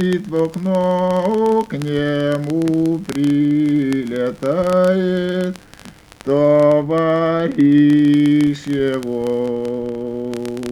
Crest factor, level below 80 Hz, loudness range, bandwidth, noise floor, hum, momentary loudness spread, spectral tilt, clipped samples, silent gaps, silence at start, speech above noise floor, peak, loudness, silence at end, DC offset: 14 dB; -50 dBFS; 3 LU; 12 kHz; -41 dBFS; none; 11 LU; -7.5 dB/octave; under 0.1%; none; 0 s; 25 dB; -2 dBFS; -17 LUFS; 0 s; under 0.1%